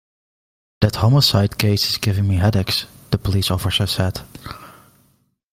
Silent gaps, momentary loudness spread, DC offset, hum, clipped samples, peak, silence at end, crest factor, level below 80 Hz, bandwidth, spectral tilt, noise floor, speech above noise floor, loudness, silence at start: none; 18 LU; under 0.1%; none; under 0.1%; 0 dBFS; 0.8 s; 20 dB; -42 dBFS; 16 kHz; -5 dB/octave; -62 dBFS; 44 dB; -18 LUFS; 0.8 s